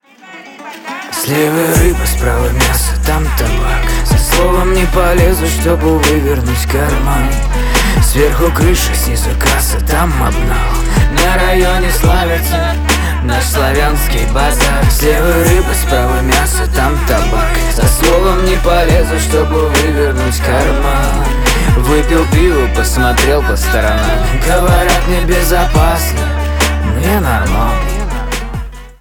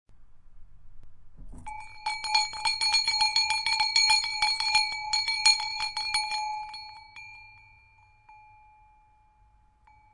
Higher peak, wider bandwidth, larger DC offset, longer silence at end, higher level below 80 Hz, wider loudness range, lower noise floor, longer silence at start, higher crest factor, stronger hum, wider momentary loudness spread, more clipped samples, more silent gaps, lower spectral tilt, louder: first, 0 dBFS vs -6 dBFS; first, over 20 kHz vs 11.5 kHz; neither; second, 0.1 s vs 1.75 s; first, -14 dBFS vs -56 dBFS; second, 1 LU vs 11 LU; second, -34 dBFS vs -62 dBFS; first, 0.25 s vs 0.1 s; second, 10 dB vs 26 dB; neither; second, 4 LU vs 22 LU; neither; neither; first, -4.5 dB/octave vs 2.5 dB/octave; first, -12 LUFS vs -24 LUFS